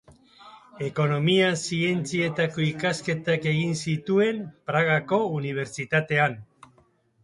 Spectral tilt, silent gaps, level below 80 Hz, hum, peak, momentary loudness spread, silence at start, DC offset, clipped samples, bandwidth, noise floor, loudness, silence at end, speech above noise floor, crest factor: -5.5 dB/octave; none; -64 dBFS; none; -8 dBFS; 8 LU; 0.1 s; under 0.1%; under 0.1%; 11.5 kHz; -62 dBFS; -25 LUFS; 0.8 s; 38 dB; 18 dB